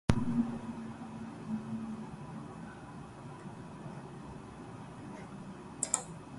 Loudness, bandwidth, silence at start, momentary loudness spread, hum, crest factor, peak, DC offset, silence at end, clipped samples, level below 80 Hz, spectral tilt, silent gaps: -40 LUFS; 11.5 kHz; 0.1 s; 14 LU; none; 30 dB; -8 dBFS; under 0.1%; 0 s; under 0.1%; -54 dBFS; -5 dB/octave; none